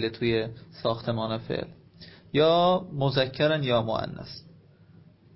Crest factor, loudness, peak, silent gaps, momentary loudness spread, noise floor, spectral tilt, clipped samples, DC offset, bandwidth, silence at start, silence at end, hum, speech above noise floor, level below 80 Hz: 18 dB; -26 LUFS; -10 dBFS; none; 15 LU; -54 dBFS; -10 dB/octave; under 0.1%; under 0.1%; 5.8 kHz; 0 s; 0.95 s; none; 28 dB; -56 dBFS